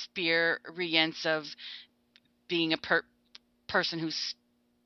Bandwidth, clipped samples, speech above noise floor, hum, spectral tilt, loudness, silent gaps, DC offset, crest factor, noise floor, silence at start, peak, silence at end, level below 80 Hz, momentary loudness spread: 7 kHz; under 0.1%; 36 dB; none; -4 dB/octave; -29 LUFS; none; under 0.1%; 24 dB; -67 dBFS; 0 s; -8 dBFS; 0.55 s; -72 dBFS; 17 LU